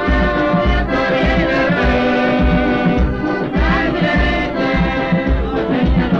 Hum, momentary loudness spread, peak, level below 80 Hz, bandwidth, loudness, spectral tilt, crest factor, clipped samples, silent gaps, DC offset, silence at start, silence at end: none; 3 LU; -2 dBFS; -22 dBFS; 6.8 kHz; -15 LUFS; -7.5 dB/octave; 12 dB; under 0.1%; none; 0.4%; 0 s; 0 s